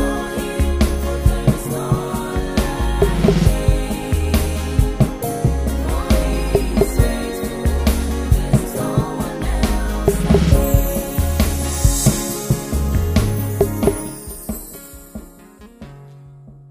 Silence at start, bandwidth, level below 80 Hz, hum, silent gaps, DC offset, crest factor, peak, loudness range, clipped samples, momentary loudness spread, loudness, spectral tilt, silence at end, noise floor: 0 s; 16 kHz; -22 dBFS; none; none; under 0.1%; 18 dB; 0 dBFS; 4 LU; under 0.1%; 10 LU; -19 LUFS; -6 dB/octave; 0.05 s; -42 dBFS